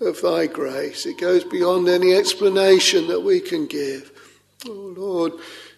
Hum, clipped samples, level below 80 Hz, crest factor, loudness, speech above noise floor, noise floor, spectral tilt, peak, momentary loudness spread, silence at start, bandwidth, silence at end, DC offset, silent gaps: 50 Hz at -55 dBFS; under 0.1%; -70 dBFS; 18 dB; -19 LUFS; 26 dB; -46 dBFS; -3.5 dB/octave; -2 dBFS; 19 LU; 0 s; 13 kHz; 0.1 s; under 0.1%; none